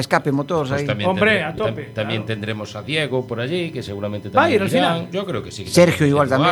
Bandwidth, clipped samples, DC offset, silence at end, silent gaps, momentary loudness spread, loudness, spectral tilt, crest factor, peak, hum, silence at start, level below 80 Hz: 19 kHz; under 0.1%; under 0.1%; 0 s; none; 12 LU; -20 LUFS; -5.5 dB/octave; 18 dB; 0 dBFS; none; 0 s; -52 dBFS